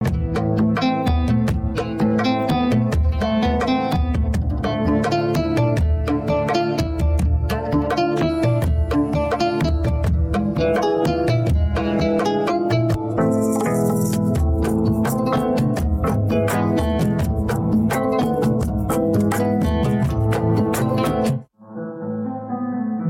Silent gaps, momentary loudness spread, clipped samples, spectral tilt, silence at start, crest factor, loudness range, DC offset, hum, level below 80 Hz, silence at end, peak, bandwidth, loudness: none; 3 LU; under 0.1%; -7 dB/octave; 0 s; 10 dB; 1 LU; under 0.1%; none; -28 dBFS; 0 s; -10 dBFS; 16.5 kHz; -20 LUFS